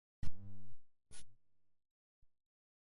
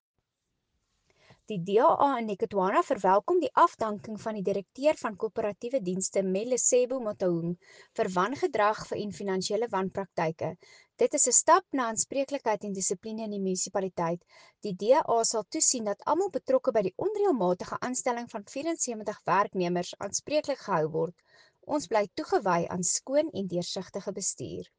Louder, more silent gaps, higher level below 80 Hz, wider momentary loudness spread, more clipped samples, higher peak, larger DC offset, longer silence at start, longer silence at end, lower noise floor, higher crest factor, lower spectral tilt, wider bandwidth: second, -57 LUFS vs -28 LUFS; neither; first, -60 dBFS vs -70 dBFS; about the same, 10 LU vs 11 LU; neither; second, -22 dBFS vs -8 dBFS; neither; second, 0.25 s vs 1.5 s; first, 1.6 s vs 0.15 s; second, -59 dBFS vs -82 dBFS; about the same, 16 dB vs 20 dB; first, -5 dB/octave vs -3.5 dB/octave; about the same, 11 kHz vs 10 kHz